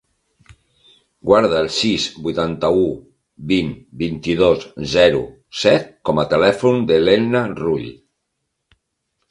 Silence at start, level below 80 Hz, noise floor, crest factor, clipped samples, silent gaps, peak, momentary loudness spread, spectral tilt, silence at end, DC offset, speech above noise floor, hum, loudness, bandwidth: 1.25 s; -46 dBFS; -75 dBFS; 18 dB; under 0.1%; none; 0 dBFS; 11 LU; -5.5 dB/octave; 1.35 s; under 0.1%; 58 dB; none; -17 LUFS; 11 kHz